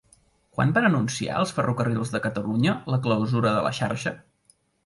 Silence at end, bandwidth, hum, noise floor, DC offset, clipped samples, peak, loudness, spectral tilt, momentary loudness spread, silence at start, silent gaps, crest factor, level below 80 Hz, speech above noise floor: 0.7 s; 11.5 kHz; none; -64 dBFS; under 0.1%; under 0.1%; -8 dBFS; -24 LUFS; -6 dB/octave; 7 LU; 0.6 s; none; 18 dB; -58 dBFS; 40 dB